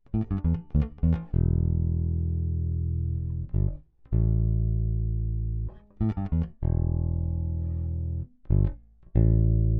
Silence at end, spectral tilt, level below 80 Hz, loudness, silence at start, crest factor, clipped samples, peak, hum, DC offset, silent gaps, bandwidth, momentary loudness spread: 0 s; -12.5 dB/octave; -30 dBFS; -28 LUFS; 0.1 s; 16 dB; under 0.1%; -10 dBFS; none; under 0.1%; none; 2.6 kHz; 6 LU